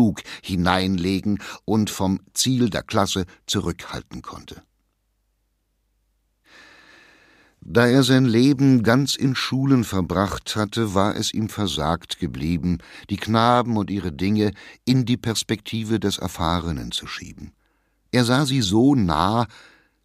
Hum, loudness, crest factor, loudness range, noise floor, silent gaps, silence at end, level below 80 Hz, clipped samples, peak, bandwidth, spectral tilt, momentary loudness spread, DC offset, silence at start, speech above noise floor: none; -21 LUFS; 22 dB; 7 LU; -70 dBFS; none; 0.6 s; -46 dBFS; under 0.1%; 0 dBFS; 15.5 kHz; -5.5 dB/octave; 12 LU; under 0.1%; 0 s; 49 dB